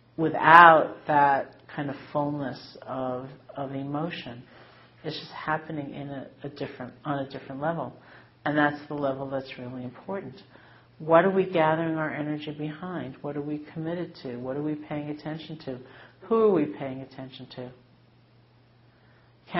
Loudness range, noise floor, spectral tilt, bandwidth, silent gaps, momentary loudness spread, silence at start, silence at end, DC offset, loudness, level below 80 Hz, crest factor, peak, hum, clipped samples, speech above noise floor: 8 LU; -58 dBFS; -4 dB/octave; 5.8 kHz; none; 18 LU; 0.2 s; 0 s; under 0.1%; -26 LUFS; -66 dBFS; 28 dB; 0 dBFS; none; under 0.1%; 32 dB